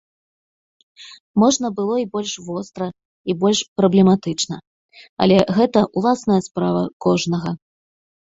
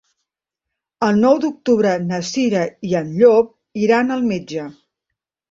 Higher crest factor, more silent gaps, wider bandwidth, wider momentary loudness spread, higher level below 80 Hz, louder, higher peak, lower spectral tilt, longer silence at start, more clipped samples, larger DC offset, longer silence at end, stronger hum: about the same, 20 dB vs 16 dB; first, 1.20-1.34 s, 3.05-3.25 s, 3.68-3.76 s, 4.67-4.89 s, 5.09-5.17 s, 6.93-7.00 s vs none; about the same, 7.8 kHz vs 7.8 kHz; about the same, 14 LU vs 12 LU; about the same, -56 dBFS vs -60 dBFS; about the same, -19 LUFS vs -17 LUFS; about the same, 0 dBFS vs -2 dBFS; about the same, -5.5 dB/octave vs -6 dB/octave; about the same, 1 s vs 1 s; neither; neither; about the same, 0.75 s vs 0.8 s; neither